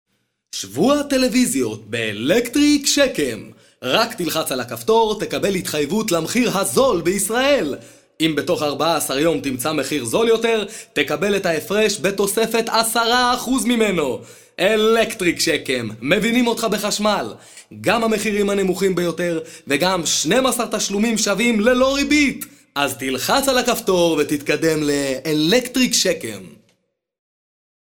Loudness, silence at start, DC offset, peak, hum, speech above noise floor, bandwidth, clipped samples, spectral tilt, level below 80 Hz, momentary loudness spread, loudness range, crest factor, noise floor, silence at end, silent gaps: -18 LUFS; 0.55 s; under 0.1%; 0 dBFS; none; 48 dB; 18 kHz; under 0.1%; -3.5 dB/octave; -48 dBFS; 8 LU; 2 LU; 18 dB; -67 dBFS; 1.4 s; none